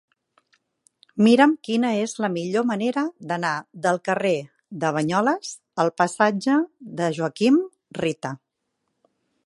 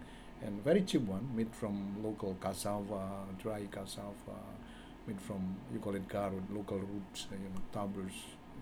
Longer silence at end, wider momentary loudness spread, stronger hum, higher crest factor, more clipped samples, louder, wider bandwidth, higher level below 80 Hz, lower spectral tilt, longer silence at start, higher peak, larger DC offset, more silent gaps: first, 1.1 s vs 0 s; about the same, 12 LU vs 13 LU; neither; about the same, 20 dB vs 22 dB; neither; first, -22 LUFS vs -40 LUFS; second, 11.5 kHz vs 17.5 kHz; second, -70 dBFS vs -58 dBFS; about the same, -5.5 dB/octave vs -6 dB/octave; first, 1.15 s vs 0 s; first, -2 dBFS vs -18 dBFS; neither; neither